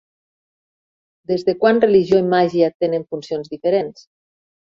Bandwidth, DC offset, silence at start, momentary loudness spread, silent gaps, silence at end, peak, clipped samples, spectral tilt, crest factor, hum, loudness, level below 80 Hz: 7.4 kHz; under 0.1%; 1.3 s; 12 LU; 2.75-2.80 s; 0.85 s; 0 dBFS; under 0.1%; -7 dB/octave; 18 dB; none; -18 LUFS; -60 dBFS